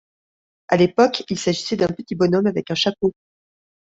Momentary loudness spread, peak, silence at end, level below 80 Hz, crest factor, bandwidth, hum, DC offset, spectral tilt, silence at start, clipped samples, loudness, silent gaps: 6 LU; -2 dBFS; 0.85 s; -58 dBFS; 20 dB; 7.8 kHz; none; under 0.1%; -5.5 dB/octave; 0.7 s; under 0.1%; -20 LUFS; none